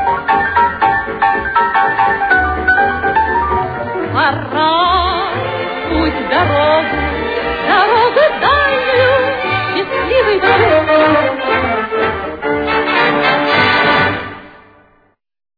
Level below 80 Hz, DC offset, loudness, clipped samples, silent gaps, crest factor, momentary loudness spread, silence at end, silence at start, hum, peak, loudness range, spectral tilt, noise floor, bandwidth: -34 dBFS; under 0.1%; -13 LUFS; under 0.1%; none; 14 dB; 7 LU; 1.1 s; 0 s; none; 0 dBFS; 2 LU; -7 dB/octave; -55 dBFS; 5 kHz